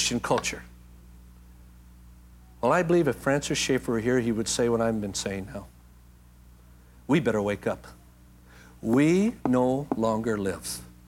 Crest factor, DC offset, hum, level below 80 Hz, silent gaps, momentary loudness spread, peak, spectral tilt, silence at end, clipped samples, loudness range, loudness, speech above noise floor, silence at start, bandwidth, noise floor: 18 dB; under 0.1%; 60 Hz at -50 dBFS; -50 dBFS; none; 13 LU; -8 dBFS; -5 dB/octave; 0.2 s; under 0.1%; 6 LU; -26 LUFS; 27 dB; 0 s; 17 kHz; -53 dBFS